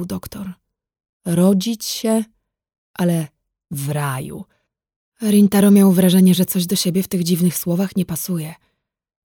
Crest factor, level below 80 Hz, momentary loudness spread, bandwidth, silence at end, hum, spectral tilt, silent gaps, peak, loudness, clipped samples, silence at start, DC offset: 16 dB; -56 dBFS; 20 LU; 20 kHz; 0.7 s; none; -6 dB/octave; 1.09-1.20 s, 2.78-2.94 s, 4.96-5.12 s; -2 dBFS; -17 LUFS; under 0.1%; 0 s; under 0.1%